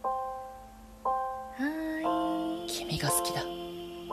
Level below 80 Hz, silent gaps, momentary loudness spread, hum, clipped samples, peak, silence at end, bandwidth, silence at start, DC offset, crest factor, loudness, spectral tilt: -56 dBFS; none; 13 LU; none; under 0.1%; -14 dBFS; 0 s; 14 kHz; 0 s; under 0.1%; 20 dB; -33 LUFS; -3.5 dB/octave